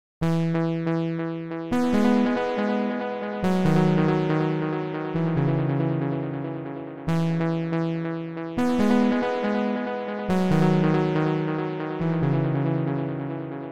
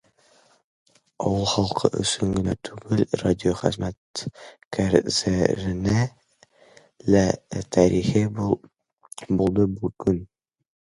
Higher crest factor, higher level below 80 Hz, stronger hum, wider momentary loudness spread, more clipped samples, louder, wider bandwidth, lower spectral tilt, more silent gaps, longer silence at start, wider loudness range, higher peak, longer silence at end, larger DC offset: second, 16 dB vs 24 dB; second, -54 dBFS vs -44 dBFS; neither; about the same, 10 LU vs 11 LU; neither; about the same, -25 LUFS vs -23 LUFS; second, 10 kHz vs 11.5 kHz; first, -8 dB/octave vs -5.5 dB/octave; second, none vs 3.97-4.14 s, 4.65-4.71 s; second, 0.2 s vs 1.2 s; about the same, 3 LU vs 2 LU; second, -8 dBFS vs -2 dBFS; second, 0 s vs 0.7 s; neither